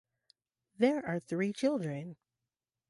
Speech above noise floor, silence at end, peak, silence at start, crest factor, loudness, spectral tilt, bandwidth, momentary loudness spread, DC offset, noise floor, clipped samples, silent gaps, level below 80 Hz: over 58 dB; 0.75 s; -14 dBFS; 0.8 s; 20 dB; -33 LUFS; -6.5 dB/octave; 11.5 kHz; 11 LU; under 0.1%; under -90 dBFS; under 0.1%; none; -76 dBFS